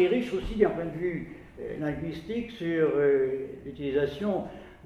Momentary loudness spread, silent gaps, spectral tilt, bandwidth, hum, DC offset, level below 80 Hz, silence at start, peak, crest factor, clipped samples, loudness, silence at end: 14 LU; none; -7.5 dB/octave; 9.6 kHz; none; under 0.1%; -48 dBFS; 0 s; -10 dBFS; 20 dB; under 0.1%; -29 LUFS; 0 s